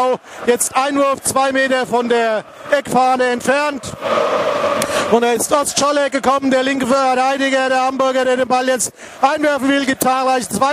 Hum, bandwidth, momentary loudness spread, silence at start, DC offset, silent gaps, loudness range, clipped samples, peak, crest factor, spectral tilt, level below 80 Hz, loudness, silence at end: none; 15.5 kHz; 4 LU; 0 s; under 0.1%; none; 1 LU; under 0.1%; 0 dBFS; 16 dB; -2.5 dB/octave; -54 dBFS; -16 LUFS; 0 s